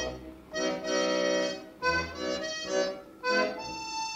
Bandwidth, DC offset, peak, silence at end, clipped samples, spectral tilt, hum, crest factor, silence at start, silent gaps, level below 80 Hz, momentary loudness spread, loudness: 16 kHz; under 0.1%; -16 dBFS; 0 s; under 0.1%; -2.5 dB/octave; none; 16 dB; 0 s; none; -56 dBFS; 8 LU; -31 LUFS